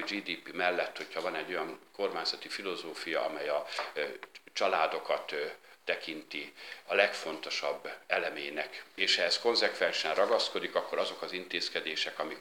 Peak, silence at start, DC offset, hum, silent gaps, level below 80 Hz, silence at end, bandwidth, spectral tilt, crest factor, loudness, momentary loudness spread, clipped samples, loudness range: -10 dBFS; 0 s; under 0.1%; none; none; -90 dBFS; 0 s; 18 kHz; -1.5 dB/octave; 24 dB; -33 LUFS; 11 LU; under 0.1%; 5 LU